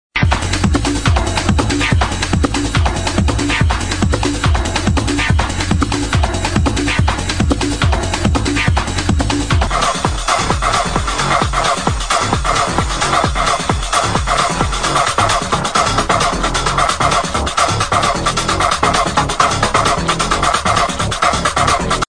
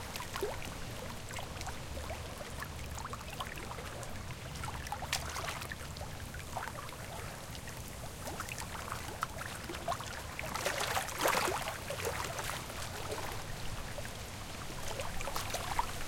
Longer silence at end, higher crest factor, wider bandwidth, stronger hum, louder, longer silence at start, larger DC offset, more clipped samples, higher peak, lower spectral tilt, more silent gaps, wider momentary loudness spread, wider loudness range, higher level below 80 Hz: about the same, 0 s vs 0 s; second, 14 dB vs 24 dB; second, 10 kHz vs 17 kHz; neither; first, -15 LUFS vs -40 LUFS; about the same, 0.1 s vs 0 s; first, 1% vs under 0.1%; neither; first, 0 dBFS vs -16 dBFS; about the same, -4 dB/octave vs -3 dB/octave; neither; second, 3 LU vs 9 LU; second, 2 LU vs 7 LU; first, -22 dBFS vs -50 dBFS